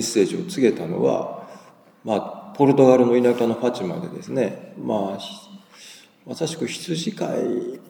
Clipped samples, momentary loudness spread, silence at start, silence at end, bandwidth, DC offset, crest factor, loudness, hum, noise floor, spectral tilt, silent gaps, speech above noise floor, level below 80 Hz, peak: under 0.1%; 19 LU; 0 s; 0.1 s; 20 kHz; under 0.1%; 20 dB; -21 LUFS; none; -48 dBFS; -5.5 dB/octave; none; 27 dB; -74 dBFS; -2 dBFS